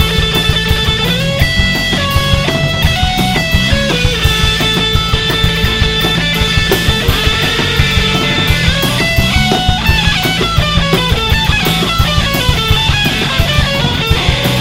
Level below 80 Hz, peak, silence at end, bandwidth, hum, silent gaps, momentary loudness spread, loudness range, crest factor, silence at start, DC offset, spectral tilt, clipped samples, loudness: -20 dBFS; 0 dBFS; 0 s; 16.5 kHz; none; none; 1 LU; 1 LU; 12 dB; 0 s; 0.5%; -4 dB/octave; under 0.1%; -11 LUFS